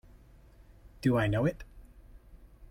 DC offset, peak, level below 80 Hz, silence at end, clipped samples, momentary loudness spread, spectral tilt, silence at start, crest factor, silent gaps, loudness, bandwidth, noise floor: under 0.1%; -16 dBFS; -52 dBFS; 0.05 s; under 0.1%; 23 LU; -8 dB/octave; 1 s; 18 dB; none; -30 LUFS; 16.5 kHz; -56 dBFS